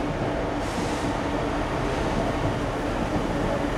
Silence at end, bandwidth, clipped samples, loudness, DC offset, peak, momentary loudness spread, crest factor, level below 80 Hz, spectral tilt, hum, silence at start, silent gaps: 0 s; 13.5 kHz; under 0.1%; -27 LUFS; under 0.1%; -12 dBFS; 2 LU; 12 dB; -36 dBFS; -6 dB/octave; none; 0 s; none